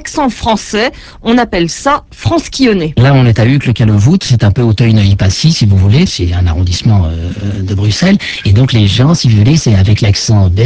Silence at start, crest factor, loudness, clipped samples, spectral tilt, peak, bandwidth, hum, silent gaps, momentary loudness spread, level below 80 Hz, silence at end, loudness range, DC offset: 0 s; 8 dB; -10 LUFS; 0.3%; -6 dB/octave; 0 dBFS; 8 kHz; none; none; 6 LU; -22 dBFS; 0 s; 2 LU; under 0.1%